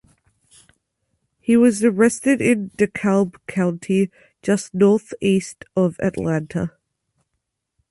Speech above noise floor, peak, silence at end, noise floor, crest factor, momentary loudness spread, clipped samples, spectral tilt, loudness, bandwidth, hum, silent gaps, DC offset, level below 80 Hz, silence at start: 58 dB; -4 dBFS; 1.25 s; -77 dBFS; 16 dB; 10 LU; under 0.1%; -6.5 dB/octave; -20 LUFS; 11.5 kHz; none; none; under 0.1%; -56 dBFS; 1.5 s